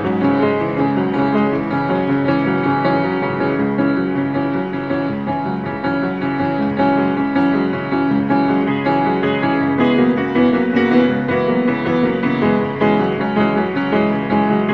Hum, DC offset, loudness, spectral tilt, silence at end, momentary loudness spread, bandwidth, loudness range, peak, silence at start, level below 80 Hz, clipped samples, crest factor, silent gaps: none; 0.3%; -17 LUFS; -9 dB/octave; 0 s; 5 LU; 5.6 kHz; 3 LU; -2 dBFS; 0 s; -50 dBFS; under 0.1%; 14 dB; none